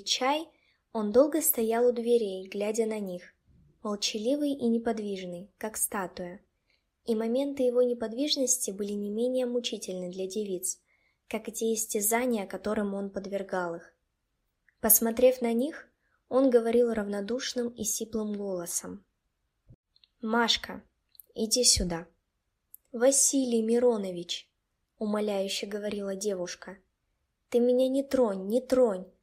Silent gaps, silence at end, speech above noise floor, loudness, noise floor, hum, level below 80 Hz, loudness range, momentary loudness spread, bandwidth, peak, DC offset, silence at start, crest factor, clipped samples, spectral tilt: 19.75-19.83 s; 0.15 s; 51 dB; -28 LUFS; -80 dBFS; none; -56 dBFS; 6 LU; 15 LU; 16 kHz; -6 dBFS; under 0.1%; 0 s; 24 dB; under 0.1%; -3 dB/octave